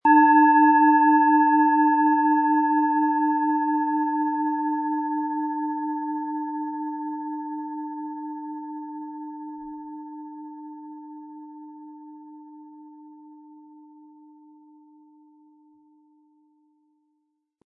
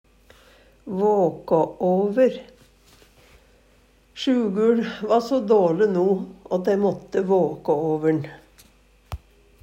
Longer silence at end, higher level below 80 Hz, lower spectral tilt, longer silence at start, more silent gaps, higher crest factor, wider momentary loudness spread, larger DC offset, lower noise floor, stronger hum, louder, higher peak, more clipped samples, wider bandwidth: first, 4.3 s vs 0.45 s; second, -74 dBFS vs -54 dBFS; about the same, -8.5 dB/octave vs -7.5 dB/octave; second, 0.05 s vs 0.85 s; neither; about the same, 18 dB vs 16 dB; first, 25 LU vs 15 LU; neither; first, -75 dBFS vs -57 dBFS; neither; about the same, -22 LUFS vs -22 LUFS; about the same, -6 dBFS vs -6 dBFS; neither; second, 2.8 kHz vs 15.5 kHz